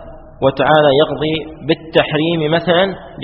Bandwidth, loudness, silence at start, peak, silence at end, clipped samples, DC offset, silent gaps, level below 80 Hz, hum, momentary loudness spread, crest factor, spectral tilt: 5.8 kHz; -15 LUFS; 0 s; 0 dBFS; 0 s; under 0.1%; under 0.1%; none; -42 dBFS; none; 9 LU; 14 dB; -3.5 dB/octave